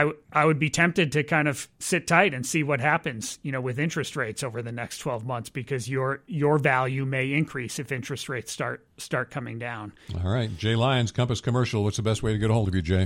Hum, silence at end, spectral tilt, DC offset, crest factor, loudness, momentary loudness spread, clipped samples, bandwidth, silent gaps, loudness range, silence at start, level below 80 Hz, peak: none; 0 s; -5 dB/octave; under 0.1%; 22 dB; -26 LUFS; 11 LU; under 0.1%; 16.5 kHz; none; 6 LU; 0 s; -50 dBFS; -4 dBFS